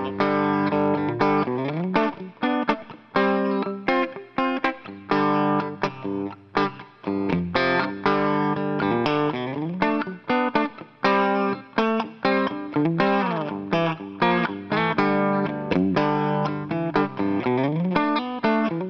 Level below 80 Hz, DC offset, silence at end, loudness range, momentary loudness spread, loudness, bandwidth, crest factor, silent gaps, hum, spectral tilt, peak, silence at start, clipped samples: -58 dBFS; under 0.1%; 0 s; 2 LU; 6 LU; -23 LUFS; 6.6 kHz; 20 dB; none; none; -8 dB/octave; -4 dBFS; 0 s; under 0.1%